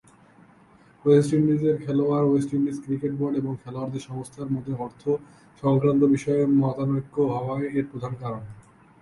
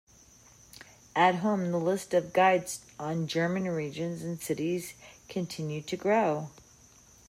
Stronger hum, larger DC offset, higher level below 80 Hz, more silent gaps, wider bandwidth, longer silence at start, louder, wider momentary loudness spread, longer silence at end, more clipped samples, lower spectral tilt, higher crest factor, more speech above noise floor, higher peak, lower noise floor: neither; neither; first, -58 dBFS vs -68 dBFS; neither; second, 11.5 kHz vs 16 kHz; about the same, 1.05 s vs 1.15 s; first, -24 LUFS vs -30 LUFS; about the same, 13 LU vs 15 LU; second, 0.4 s vs 0.8 s; neither; first, -8.5 dB/octave vs -5.5 dB/octave; about the same, 18 dB vs 20 dB; about the same, 31 dB vs 28 dB; first, -6 dBFS vs -10 dBFS; about the same, -55 dBFS vs -57 dBFS